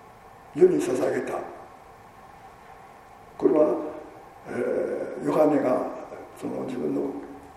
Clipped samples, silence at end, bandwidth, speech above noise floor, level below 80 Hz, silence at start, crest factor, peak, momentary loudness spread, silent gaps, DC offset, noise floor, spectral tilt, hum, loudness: under 0.1%; 0.05 s; 13.5 kHz; 24 dB; -62 dBFS; 0.1 s; 20 dB; -6 dBFS; 23 LU; none; under 0.1%; -48 dBFS; -7 dB/octave; none; -25 LUFS